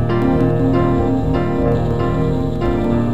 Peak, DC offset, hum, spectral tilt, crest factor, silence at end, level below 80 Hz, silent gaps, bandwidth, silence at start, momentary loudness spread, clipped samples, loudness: -4 dBFS; 4%; none; -9.5 dB/octave; 12 dB; 0 s; -28 dBFS; none; 8 kHz; 0 s; 3 LU; under 0.1%; -17 LUFS